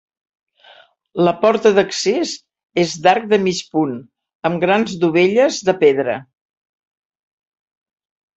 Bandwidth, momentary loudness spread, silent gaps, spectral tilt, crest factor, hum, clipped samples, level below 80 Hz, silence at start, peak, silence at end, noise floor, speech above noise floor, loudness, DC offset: 8.2 kHz; 11 LU; 4.35-4.40 s; -4.5 dB/octave; 18 dB; none; under 0.1%; -62 dBFS; 1.15 s; 0 dBFS; 2.15 s; -48 dBFS; 33 dB; -16 LUFS; under 0.1%